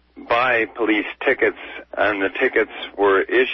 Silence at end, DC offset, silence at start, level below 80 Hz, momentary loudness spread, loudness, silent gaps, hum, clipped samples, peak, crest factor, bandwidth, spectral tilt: 0 s; under 0.1%; 0.15 s; -56 dBFS; 5 LU; -19 LUFS; none; none; under 0.1%; -6 dBFS; 14 dB; 6 kHz; -6 dB/octave